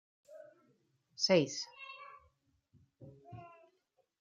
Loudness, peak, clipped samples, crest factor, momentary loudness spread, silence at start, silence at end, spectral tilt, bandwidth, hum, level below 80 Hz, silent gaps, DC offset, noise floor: -33 LUFS; -16 dBFS; under 0.1%; 24 dB; 27 LU; 0.3 s; 0.7 s; -4 dB/octave; 7.6 kHz; none; -80 dBFS; none; under 0.1%; -78 dBFS